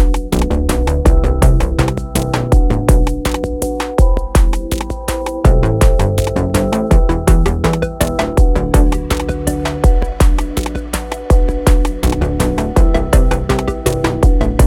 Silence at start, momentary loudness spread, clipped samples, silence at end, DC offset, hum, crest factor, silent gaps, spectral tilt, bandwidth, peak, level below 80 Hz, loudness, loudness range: 0 s; 6 LU; under 0.1%; 0 s; under 0.1%; none; 12 dB; none; -6 dB/octave; 16.5 kHz; 0 dBFS; -14 dBFS; -15 LUFS; 2 LU